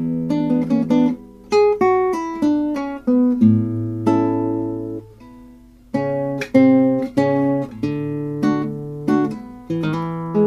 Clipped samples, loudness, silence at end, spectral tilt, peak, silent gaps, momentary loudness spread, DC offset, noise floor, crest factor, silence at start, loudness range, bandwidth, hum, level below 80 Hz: under 0.1%; -19 LUFS; 0 s; -8.5 dB/octave; -2 dBFS; none; 10 LU; under 0.1%; -44 dBFS; 16 dB; 0 s; 3 LU; 10.5 kHz; none; -50 dBFS